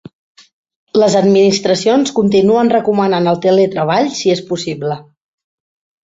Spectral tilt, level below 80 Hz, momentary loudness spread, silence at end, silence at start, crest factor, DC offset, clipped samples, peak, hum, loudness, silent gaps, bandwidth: -5.5 dB/octave; -56 dBFS; 9 LU; 1 s; 0.95 s; 12 dB; under 0.1%; under 0.1%; -2 dBFS; none; -13 LUFS; none; 8 kHz